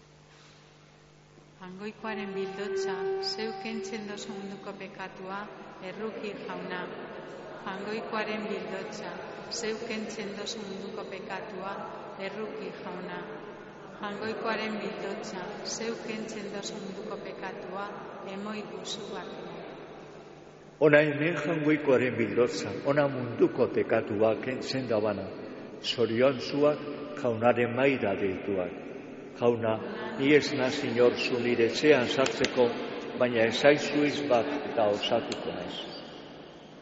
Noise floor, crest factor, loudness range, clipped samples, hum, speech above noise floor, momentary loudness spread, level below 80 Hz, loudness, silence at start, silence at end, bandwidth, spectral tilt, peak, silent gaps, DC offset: -56 dBFS; 24 dB; 12 LU; under 0.1%; none; 27 dB; 17 LU; -68 dBFS; -30 LUFS; 0.3 s; 0 s; 8 kHz; -3.5 dB/octave; -6 dBFS; none; under 0.1%